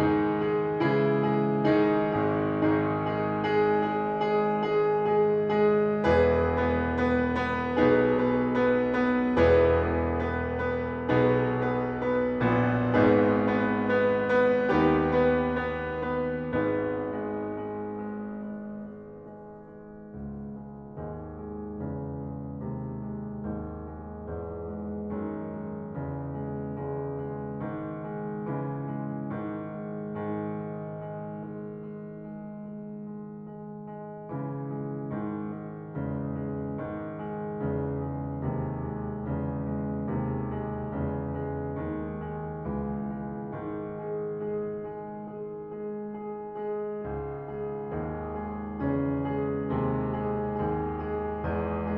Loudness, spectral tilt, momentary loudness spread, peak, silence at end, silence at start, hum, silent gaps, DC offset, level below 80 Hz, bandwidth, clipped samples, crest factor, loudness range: -29 LUFS; -9 dB/octave; 15 LU; -10 dBFS; 0 s; 0 s; none; none; under 0.1%; -48 dBFS; 6.6 kHz; under 0.1%; 18 dB; 13 LU